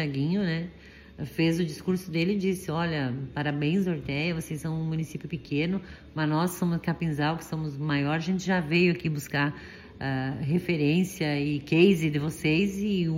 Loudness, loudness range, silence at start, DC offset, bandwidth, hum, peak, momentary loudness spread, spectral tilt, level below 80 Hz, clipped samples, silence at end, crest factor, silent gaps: -28 LUFS; 4 LU; 0 s; under 0.1%; 16 kHz; none; -8 dBFS; 9 LU; -6.5 dB/octave; -54 dBFS; under 0.1%; 0 s; 18 dB; none